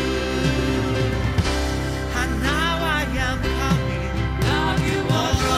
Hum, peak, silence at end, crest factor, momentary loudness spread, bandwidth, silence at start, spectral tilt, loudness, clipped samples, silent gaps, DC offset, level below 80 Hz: none; -6 dBFS; 0 s; 14 dB; 4 LU; 15.5 kHz; 0 s; -5 dB/octave; -22 LUFS; under 0.1%; none; under 0.1%; -28 dBFS